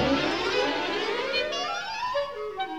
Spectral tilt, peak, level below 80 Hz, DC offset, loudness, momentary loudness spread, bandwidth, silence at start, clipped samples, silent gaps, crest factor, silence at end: -3.5 dB/octave; -12 dBFS; -52 dBFS; 0.2%; -27 LUFS; 5 LU; 15.5 kHz; 0 s; under 0.1%; none; 16 dB; 0 s